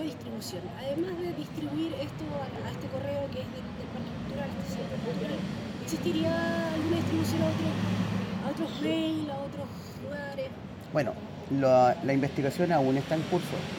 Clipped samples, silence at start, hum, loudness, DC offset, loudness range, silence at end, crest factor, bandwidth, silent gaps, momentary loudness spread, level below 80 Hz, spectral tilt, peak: under 0.1%; 0 s; none; -31 LUFS; under 0.1%; 7 LU; 0 s; 18 dB; 17 kHz; none; 11 LU; -58 dBFS; -6.5 dB/octave; -12 dBFS